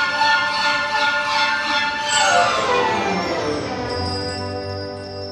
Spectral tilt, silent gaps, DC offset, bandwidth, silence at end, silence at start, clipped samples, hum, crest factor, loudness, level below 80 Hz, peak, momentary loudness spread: -2.5 dB/octave; none; under 0.1%; 13.5 kHz; 0 s; 0 s; under 0.1%; none; 16 dB; -19 LUFS; -48 dBFS; -4 dBFS; 11 LU